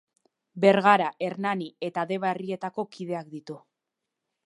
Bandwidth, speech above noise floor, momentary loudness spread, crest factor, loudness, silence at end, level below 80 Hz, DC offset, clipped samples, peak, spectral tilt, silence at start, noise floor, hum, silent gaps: 11.5 kHz; 59 dB; 20 LU; 24 dB; -26 LUFS; 0.9 s; -80 dBFS; under 0.1%; under 0.1%; -4 dBFS; -6.5 dB/octave; 0.55 s; -85 dBFS; none; none